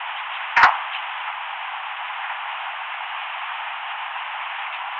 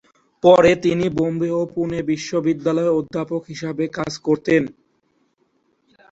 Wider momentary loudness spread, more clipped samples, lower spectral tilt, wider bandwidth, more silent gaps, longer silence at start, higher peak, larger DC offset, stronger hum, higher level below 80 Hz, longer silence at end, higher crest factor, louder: about the same, 13 LU vs 12 LU; neither; second, -0.5 dB/octave vs -6.5 dB/octave; about the same, 7.6 kHz vs 8 kHz; neither; second, 0 s vs 0.45 s; about the same, -2 dBFS vs -2 dBFS; neither; neither; second, -64 dBFS vs -52 dBFS; second, 0 s vs 1.4 s; about the same, 22 dB vs 18 dB; second, -24 LUFS vs -19 LUFS